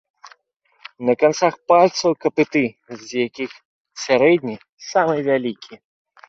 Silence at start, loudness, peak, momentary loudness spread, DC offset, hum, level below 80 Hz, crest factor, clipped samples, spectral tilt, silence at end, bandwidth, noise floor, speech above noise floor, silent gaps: 0.25 s; -19 LUFS; -2 dBFS; 16 LU; under 0.1%; none; -64 dBFS; 18 dB; under 0.1%; -5 dB/octave; 0.55 s; 7.8 kHz; -62 dBFS; 43 dB; 0.56-0.60 s, 3.65-3.85 s, 4.69-4.77 s